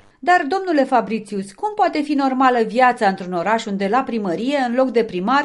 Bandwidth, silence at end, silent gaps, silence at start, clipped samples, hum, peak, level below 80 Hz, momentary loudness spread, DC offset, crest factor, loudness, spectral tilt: 11.5 kHz; 0 s; none; 0.25 s; under 0.1%; none; -2 dBFS; -62 dBFS; 7 LU; under 0.1%; 16 dB; -18 LUFS; -5.5 dB/octave